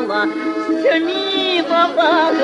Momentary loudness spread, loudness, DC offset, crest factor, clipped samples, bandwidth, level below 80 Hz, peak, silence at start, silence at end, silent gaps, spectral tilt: 6 LU; -16 LUFS; under 0.1%; 12 dB; under 0.1%; 10.5 kHz; -66 dBFS; -4 dBFS; 0 s; 0 s; none; -3.5 dB/octave